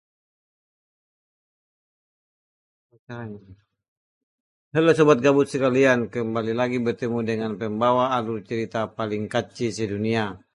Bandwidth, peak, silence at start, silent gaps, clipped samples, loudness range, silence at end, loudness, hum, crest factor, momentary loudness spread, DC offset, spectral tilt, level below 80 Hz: 11.5 kHz; -4 dBFS; 3.1 s; 3.88-4.71 s; under 0.1%; 4 LU; 0.15 s; -23 LUFS; none; 20 dB; 11 LU; under 0.1%; -6 dB/octave; -62 dBFS